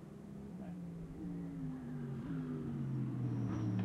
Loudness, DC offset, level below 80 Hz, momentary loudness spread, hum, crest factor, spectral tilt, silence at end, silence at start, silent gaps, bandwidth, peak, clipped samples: -43 LUFS; under 0.1%; -62 dBFS; 9 LU; none; 14 dB; -9.5 dB/octave; 0 s; 0 s; none; 10 kHz; -28 dBFS; under 0.1%